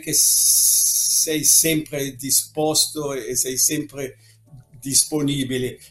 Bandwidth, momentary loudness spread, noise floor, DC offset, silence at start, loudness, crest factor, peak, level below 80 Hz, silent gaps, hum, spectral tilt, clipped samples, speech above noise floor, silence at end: 16.5 kHz; 14 LU; -47 dBFS; under 0.1%; 0 s; -17 LUFS; 20 dB; 0 dBFS; -54 dBFS; none; none; -1.5 dB/octave; under 0.1%; 27 dB; 0.05 s